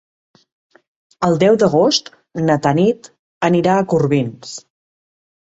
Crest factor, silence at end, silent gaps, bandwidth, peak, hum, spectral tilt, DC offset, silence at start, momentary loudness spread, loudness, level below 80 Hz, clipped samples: 16 dB; 1 s; 3.19-3.41 s; 8 kHz; -2 dBFS; none; -6 dB/octave; under 0.1%; 1.2 s; 16 LU; -16 LUFS; -56 dBFS; under 0.1%